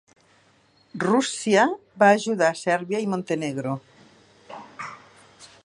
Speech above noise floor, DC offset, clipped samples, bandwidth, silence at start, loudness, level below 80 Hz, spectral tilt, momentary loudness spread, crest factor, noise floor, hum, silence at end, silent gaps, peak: 38 dB; under 0.1%; under 0.1%; 11.5 kHz; 0.95 s; -23 LUFS; -72 dBFS; -4.5 dB/octave; 20 LU; 22 dB; -60 dBFS; none; 0.2 s; none; -4 dBFS